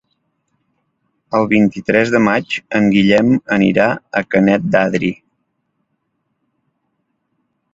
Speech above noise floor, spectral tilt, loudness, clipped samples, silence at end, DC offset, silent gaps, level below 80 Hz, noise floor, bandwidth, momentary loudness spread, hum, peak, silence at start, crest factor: 56 dB; -7 dB/octave; -14 LUFS; under 0.1%; 2.6 s; under 0.1%; none; -52 dBFS; -69 dBFS; 7.8 kHz; 8 LU; none; 0 dBFS; 1.3 s; 16 dB